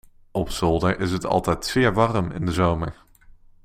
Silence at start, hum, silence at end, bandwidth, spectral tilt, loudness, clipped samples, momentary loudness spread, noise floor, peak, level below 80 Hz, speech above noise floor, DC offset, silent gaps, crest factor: 0.35 s; none; 0.7 s; 16 kHz; -6 dB/octave; -23 LUFS; under 0.1%; 9 LU; -49 dBFS; -4 dBFS; -40 dBFS; 27 dB; under 0.1%; none; 20 dB